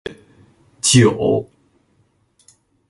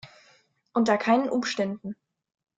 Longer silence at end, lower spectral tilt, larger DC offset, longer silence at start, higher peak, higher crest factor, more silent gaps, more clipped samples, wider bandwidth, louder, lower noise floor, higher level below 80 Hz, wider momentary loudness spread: first, 1.45 s vs 0.65 s; about the same, -4.5 dB/octave vs -5 dB/octave; neither; about the same, 0.05 s vs 0.05 s; first, 0 dBFS vs -8 dBFS; about the same, 20 dB vs 18 dB; neither; neither; first, 11.5 kHz vs 7.8 kHz; first, -15 LUFS vs -25 LUFS; about the same, -61 dBFS vs -62 dBFS; first, -50 dBFS vs -72 dBFS; second, 11 LU vs 17 LU